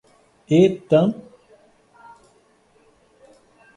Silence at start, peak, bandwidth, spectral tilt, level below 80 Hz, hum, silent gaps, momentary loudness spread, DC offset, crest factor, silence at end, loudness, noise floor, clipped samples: 0.5 s; -4 dBFS; 10.5 kHz; -8 dB/octave; -62 dBFS; none; none; 9 LU; under 0.1%; 20 dB; 2.65 s; -18 LUFS; -58 dBFS; under 0.1%